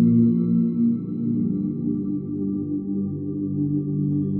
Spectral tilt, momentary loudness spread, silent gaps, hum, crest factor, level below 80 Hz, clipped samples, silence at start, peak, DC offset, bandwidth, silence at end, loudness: -15.5 dB/octave; 8 LU; none; none; 14 dB; -56 dBFS; under 0.1%; 0 s; -8 dBFS; under 0.1%; 1.4 kHz; 0 s; -24 LUFS